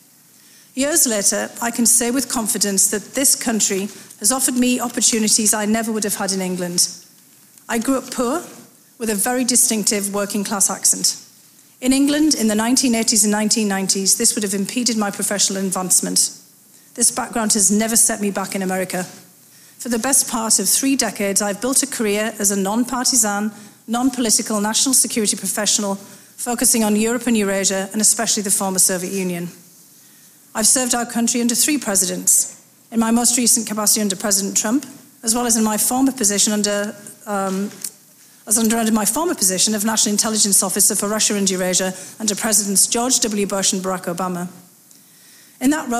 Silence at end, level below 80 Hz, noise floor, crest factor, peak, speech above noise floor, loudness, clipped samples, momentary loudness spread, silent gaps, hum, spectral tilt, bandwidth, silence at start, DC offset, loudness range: 0 s; -54 dBFS; -49 dBFS; 16 dB; -2 dBFS; 31 dB; -17 LUFS; under 0.1%; 10 LU; none; none; -2 dB/octave; 16 kHz; 0.75 s; under 0.1%; 3 LU